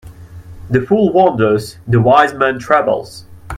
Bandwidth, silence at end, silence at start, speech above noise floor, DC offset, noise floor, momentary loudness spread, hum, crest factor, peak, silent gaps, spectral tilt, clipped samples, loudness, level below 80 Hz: 14.5 kHz; 0 s; 0.05 s; 21 dB; under 0.1%; -34 dBFS; 8 LU; none; 14 dB; 0 dBFS; none; -7 dB/octave; under 0.1%; -13 LUFS; -44 dBFS